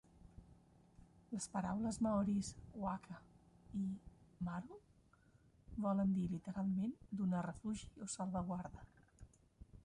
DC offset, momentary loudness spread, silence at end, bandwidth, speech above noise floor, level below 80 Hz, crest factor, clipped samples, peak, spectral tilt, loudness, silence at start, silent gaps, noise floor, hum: under 0.1%; 16 LU; 0.05 s; 11.5 kHz; 29 dB; -64 dBFS; 16 dB; under 0.1%; -28 dBFS; -6.5 dB/octave; -43 LUFS; 0.15 s; none; -70 dBFS; none